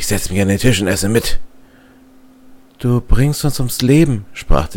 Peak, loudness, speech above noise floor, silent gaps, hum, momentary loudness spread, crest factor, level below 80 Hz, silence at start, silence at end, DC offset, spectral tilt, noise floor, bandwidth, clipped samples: 0 dBFS; -16 LUFS; 32 dB; none; none; 10 LU; 14 dB; -24 dBFS; 0 s; 0 s; under 0.1%; -5.5 dB/octave; -45 dBFS; 17 kHz; under 0.1%